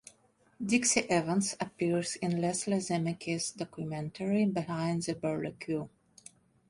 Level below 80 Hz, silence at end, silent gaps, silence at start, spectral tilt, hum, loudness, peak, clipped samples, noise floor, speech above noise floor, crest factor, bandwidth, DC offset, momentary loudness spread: -68 dBFS; 0.8 s; none; 0.6 s; -4.5 dB/octave; none; -32 LUFS; -14 dBFS; under 0.1%; -67 dBFS; 35 dB; 20 dB; 11.5 kHz; under 0.1%; 10 LU